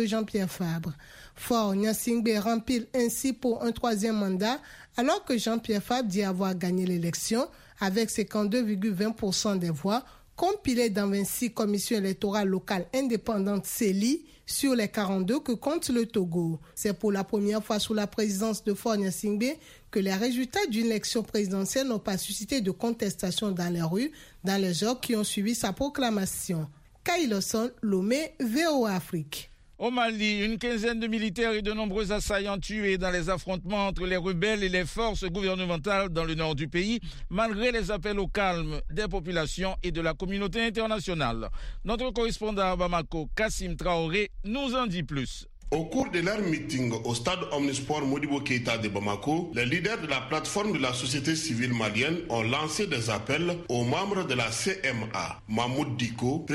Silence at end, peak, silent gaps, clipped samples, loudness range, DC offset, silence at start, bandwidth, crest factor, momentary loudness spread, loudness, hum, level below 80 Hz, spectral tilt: 0 s; -12 dBFS; none; under 0.1%; 2 LU; under 0.1%; 0 s; 16 kHz; 16 dB; 5 LU; -29 LUFS; none; -44 dBFS; -4.5 dB/octave